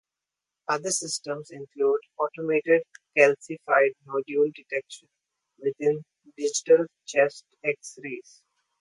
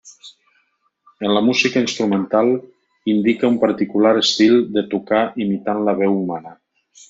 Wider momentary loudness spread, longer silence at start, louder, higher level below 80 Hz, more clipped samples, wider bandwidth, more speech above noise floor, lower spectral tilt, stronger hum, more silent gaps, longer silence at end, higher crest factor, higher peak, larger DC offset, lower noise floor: first, 15 LU vs 8 LU; first, 0.7 s vs 0.05 s; second, -26 LUFS vs -17 LUFS; second, -82 dBFS vs -62 dBFS; neither; first, 11.5 kHz vs 7.8 kHz; first, 62 dB vs 48 dB; second, -3 dB/octave vs -5 dB/octave; neither; neither; about the same, 0.6 s vs 0.55 s; first, 22 dB vs 16 dB; about the same, -4 dBFS vs -2 dBFS; neither; first, -88 dBFS vs -65 dBFS